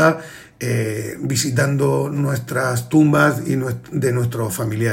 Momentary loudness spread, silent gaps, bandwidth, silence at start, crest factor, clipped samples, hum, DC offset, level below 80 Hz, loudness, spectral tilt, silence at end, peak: 9 LU; none; 16.5 kHz; 0 s; 18 dB; under 0.1%; none; under 0.1%; -54 dBFS; -19 LUFS; -6 dB/octave; 0 s; 0 dBFS